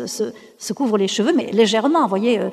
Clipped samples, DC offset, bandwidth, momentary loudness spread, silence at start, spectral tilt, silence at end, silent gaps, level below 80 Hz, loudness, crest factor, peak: under 0.1%; under 0.1%; 14 kHz; 11 LU; 0 s; -4.5 dB/octave; 0 s; none; -70 dBFS; -18 LUFS; 16 dB; -2 dBFS